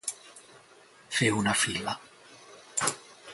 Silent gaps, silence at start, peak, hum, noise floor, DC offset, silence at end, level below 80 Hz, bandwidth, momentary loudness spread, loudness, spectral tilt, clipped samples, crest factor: none; 0.05 s; -10 dBFS; none; -56 dBFS; under 0.1%; 0 s; -62 dBFS; 12 kHz; 24 LU; -29 LUFS; -2.5 dB/octave; under 0.1%; 22 dB